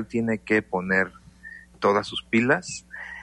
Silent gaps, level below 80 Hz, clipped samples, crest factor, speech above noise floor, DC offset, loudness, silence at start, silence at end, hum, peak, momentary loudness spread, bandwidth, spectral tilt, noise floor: none; -56 dBFS; under 0.1%; 18 dB; 21 dB; under 0.1%; -24 LUFS; 0 s; 0 s; none; -8 dBFS; 17 LU; 11 kHz; -5 dB/octave; -46 dBFS